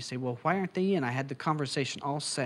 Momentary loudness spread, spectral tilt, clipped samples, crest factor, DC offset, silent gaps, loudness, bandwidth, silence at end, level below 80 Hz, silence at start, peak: 4 LU; -5 dB/octave; under 0.1%; 18 dB; under 0.1%; none; -31 LUFS; 12 kHz; 0 s; -76 dBFS; 0 s; -14 dBFS